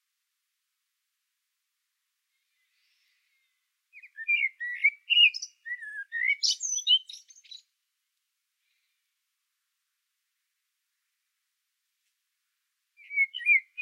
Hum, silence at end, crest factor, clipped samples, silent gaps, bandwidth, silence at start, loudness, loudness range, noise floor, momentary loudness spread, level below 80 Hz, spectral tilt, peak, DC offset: none; 0 s; 22 dB; under 0.1%; none; 14 kHz; 3.95 s; -24 LUFS; 10 LU; -82 dBFS; 17 LU; under -90 dBFS; 12.5 dB/octave; -10 dBFS; under 0.1%